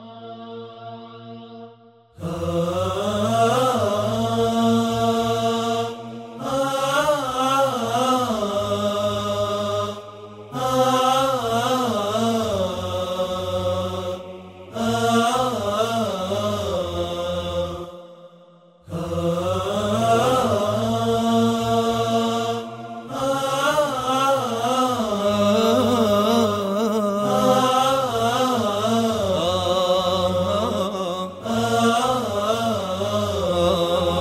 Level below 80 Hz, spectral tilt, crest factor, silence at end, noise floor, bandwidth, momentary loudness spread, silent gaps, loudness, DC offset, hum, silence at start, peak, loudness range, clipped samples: -50 dBFS; -5 dB/octave; 18 dB; 0 s; -50 dBFS; 16 kHz; 14 LU; none; -21 LUFS; under 0.1%; none; 0 s; -4 dBFS; 5 LU; under 0.1%